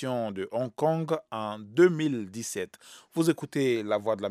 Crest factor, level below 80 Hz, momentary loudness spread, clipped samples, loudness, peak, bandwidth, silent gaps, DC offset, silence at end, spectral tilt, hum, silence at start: 20 dB; -80 dBFS; 12 LU; under 0.1%; -28 LUFS; -8 dBFS; 14.5 kHz; none; under 0.1%; 0 s; -6 dB/octave; none; 0 s